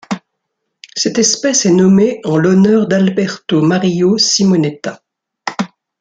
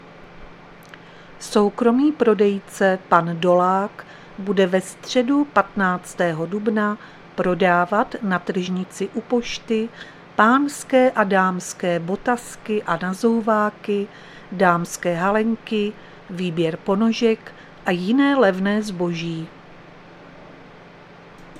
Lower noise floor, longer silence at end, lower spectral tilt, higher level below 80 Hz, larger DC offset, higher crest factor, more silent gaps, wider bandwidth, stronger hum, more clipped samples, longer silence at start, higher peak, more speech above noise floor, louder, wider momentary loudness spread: first, -73 dBFS vs -44 dBFS; first, 0.35 s vs 0 s; about the same, -4.5 dB/octave vs -5.5 dB/octave; about the same, -54 dBFS vs -54 dBFS; neither; second, 12 dB vs 20 dB; neither; second, 9 kHz vs 15 kHz; neither; neither; about the same, 0.1 s vs 0.05 s; about the same, 0 dBFS vs 0 dBFS; first, 61 dB vs 24 dB; first, -12 LUFS vs -20 LUFS; first, 15 LU vs 11 LU